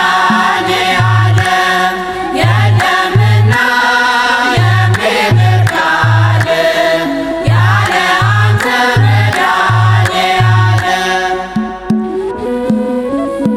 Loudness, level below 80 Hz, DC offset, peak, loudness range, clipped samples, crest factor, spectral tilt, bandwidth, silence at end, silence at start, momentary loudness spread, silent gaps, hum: -10 LUFS; -38 dBFS; under 0.1%; 0 dBFS; 2 LU; under 0.1%; 10 dB; -5.5 dB/octave; 13.5 kHz; 0 s; 0 s; 6 LU; none; none